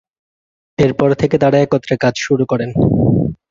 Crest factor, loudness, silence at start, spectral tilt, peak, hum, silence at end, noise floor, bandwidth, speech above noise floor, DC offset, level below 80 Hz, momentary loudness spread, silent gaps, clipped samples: 14 dB; -15 LUFS; 0.8 s; -7 dB/octave; -2 dBFS; none; 0.15 s; under -90 dBFS; 7.6 kHz; over 77 dB; under 0.1%; -38 dBFS; 4 LU; none; under 0.1%